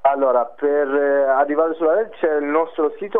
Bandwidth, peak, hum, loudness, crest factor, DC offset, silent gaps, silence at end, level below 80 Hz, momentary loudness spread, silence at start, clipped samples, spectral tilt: 3.8 kHz; -4 dBFS; none; -19 LUFS; 14 dB; 0.7%; none; 0 s; -70 dBFS; 4 LU; 0.05 s; under 0.1%; -8 dB/octave